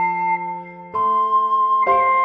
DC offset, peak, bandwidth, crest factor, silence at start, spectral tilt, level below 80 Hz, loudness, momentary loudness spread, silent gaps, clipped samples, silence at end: under 0.1%; -4 dBFS; 5.4 kHz; 14 dB; 0 s; -7 dB/octave; -60 dBFS; -18 LUFS; 12 LU; none; under 0.1%; 0 s